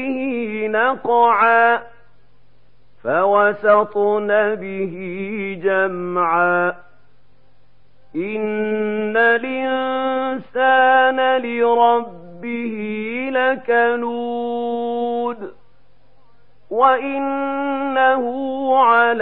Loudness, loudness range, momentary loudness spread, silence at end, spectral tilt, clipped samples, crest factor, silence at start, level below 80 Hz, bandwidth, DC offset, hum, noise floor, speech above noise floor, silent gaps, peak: -18 LUFS; 5 LU; 12 LU; 0 s; -10 dB/octave; under 0.1%; 16 dB; 0 s; -64 dBFS; 4.3 kHz; 0.8%; none; -57 dBFS; 40 dB; none; -2 dBFS